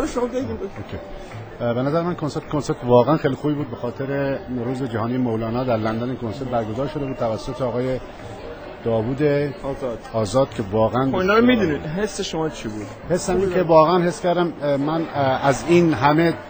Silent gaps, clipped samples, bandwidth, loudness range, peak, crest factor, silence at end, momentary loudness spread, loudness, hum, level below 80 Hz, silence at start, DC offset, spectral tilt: none; under 0.1%; over 20 kHz; 5 LU; -2 dBFS; 18 dB; 0 s; 13 LU; -21 LUFS; none; -44 dBFS; 0 s; under 0.1%; -6.5 dB/octave